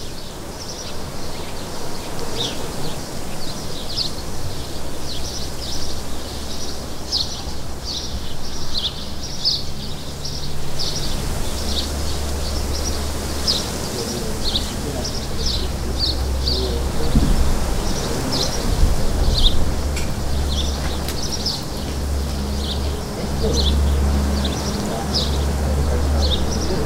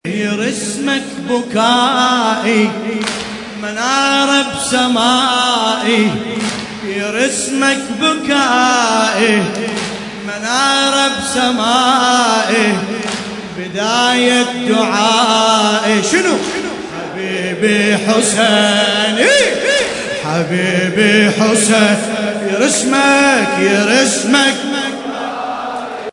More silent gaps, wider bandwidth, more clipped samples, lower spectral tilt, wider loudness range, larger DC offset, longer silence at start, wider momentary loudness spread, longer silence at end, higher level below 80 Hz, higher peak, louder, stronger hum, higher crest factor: neither; first, 16 kHz vs 11 kHz; neither; about the same, -4 dB/octave vs -3 dB/octave; first, 6 LU vs 2 LU; neither; about the same, 0 s vs 0.05 s; about the same, 10 LU vs 11 LU; about the same, 0 s vs 0 s; first, -24 dBFS vs -54 dBFS; about the same, 0 dBFS vs 0 dBFS; second, -23 LUFS vs -13 LUFS; neither; first, 20 dB vs 14 dB